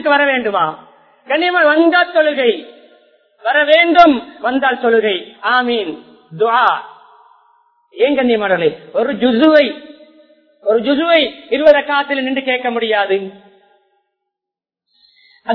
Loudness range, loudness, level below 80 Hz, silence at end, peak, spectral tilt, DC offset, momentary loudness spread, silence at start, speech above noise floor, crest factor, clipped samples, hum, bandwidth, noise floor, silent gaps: 4 LU; -14 LUFS; -56 dBFS; 0 s; 0 dBFS; -6 dB/octave; under 0.1%; 10 LU; 0 s; 72 dB; 16 dB; 0.2%; none; 5.4 kHz; -85 dBFS; none